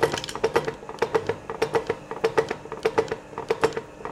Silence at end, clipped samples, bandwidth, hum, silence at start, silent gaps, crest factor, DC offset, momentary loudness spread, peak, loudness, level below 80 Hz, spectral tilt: 0 s; under 0.1%; 14.5 kHz; none; 0 s; none; 20 dB; under 0.1%; 7 LU; -6 dBFS; -27 LUFS; -54 dBFS; -4.5 dB/octave